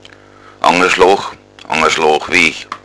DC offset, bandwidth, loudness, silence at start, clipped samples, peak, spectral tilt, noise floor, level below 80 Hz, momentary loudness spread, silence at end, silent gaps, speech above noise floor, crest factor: under 0.1%; 11 kHz; -12 LUFS; 0.65 s; 0.3%; 0 dBFS; -2.5 dB/octave; -40 dBFS; -46 dBFS; 7 LU; 0.05 s; none; 28 dB; 14 dB